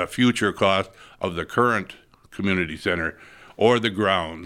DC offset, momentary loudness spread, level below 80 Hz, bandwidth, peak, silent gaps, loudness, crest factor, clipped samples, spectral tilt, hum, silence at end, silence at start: under 0.1%; 10 LU; -52 dBFS; 15.5 kHz; -4 dBFS; none; -22 LUFS; 20 dB; under 0.1%; -5 dB/octave; none; 0 s; 0 s